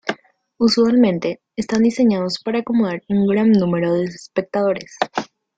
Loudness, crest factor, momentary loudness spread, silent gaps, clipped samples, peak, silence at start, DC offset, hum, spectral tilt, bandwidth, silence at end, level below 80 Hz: -18 LUFS; 16 dB; 11 LU; none; under 0.1%; -2 dBFS; 0.05 s; under 0.1%; none; -6 dB/octave; 8 kHz; 0.35 s; -58 dBFS